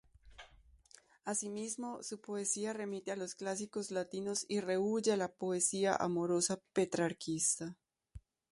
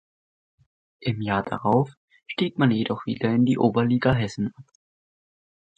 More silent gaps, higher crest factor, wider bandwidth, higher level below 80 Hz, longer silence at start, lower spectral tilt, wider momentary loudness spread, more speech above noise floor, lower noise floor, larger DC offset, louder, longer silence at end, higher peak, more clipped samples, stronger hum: second, none vs 1.97-2.08 s; about the same, 22 dB vs 20 dB; first, 11.5 kHz vs 8.2 kHz; second, -68 dBFS vs -52 dBFS; second, 0.25 s vs 1 s; second, -3.5 dB/octave vs -7.5 dB/octave; about the same, 8 LU vs 10 LU; second, 28 dB vs over 67 dB; second, -64 dBFS vs under -90 dBFS; neither; second, -36 LUFS vs -24 LUFS; second, 0.3 s vs 1.15 s; second, -16 dBFS vs -6 dBFS; neither; neither